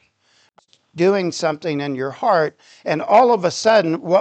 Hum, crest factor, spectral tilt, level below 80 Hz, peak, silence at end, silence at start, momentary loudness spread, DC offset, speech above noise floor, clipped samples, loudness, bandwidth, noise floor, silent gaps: none; 16 dB; -5 dB/octave; -72 dBFS; -2 dBFS; 0 s; 0.95 s; 10 LU; under 0.1%; 42 dB; under 0.1%; -18 LUFS; 9 kHz; -60 dBFS; none